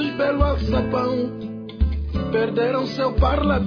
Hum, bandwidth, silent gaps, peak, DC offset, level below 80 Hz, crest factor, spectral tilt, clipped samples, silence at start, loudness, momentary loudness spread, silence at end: none; 5.4 kHz; none; -6 dBFS; under 0.1%; -26 dBFS; 14 dB; -8.5 dB/octave; under 0.1%; 0 s; -22 LUFS; 6 LU; 0 s